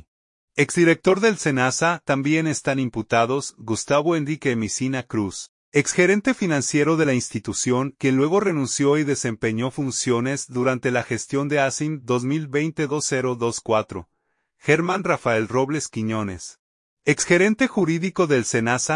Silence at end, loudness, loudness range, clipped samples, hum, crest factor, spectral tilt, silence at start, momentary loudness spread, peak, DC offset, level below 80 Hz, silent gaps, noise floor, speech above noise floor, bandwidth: 0 s; -21 LUFS; 3 LU; under 0.1%; none; 18 dB; -4.5 dB/octave; 0.55 s; 8 LU; -4 dBFS; under 0.1%; -60 dBFS; 5.49-5.72 s, 16.59-16.97 s; -69 dBFS; 48 dB; 11 kHz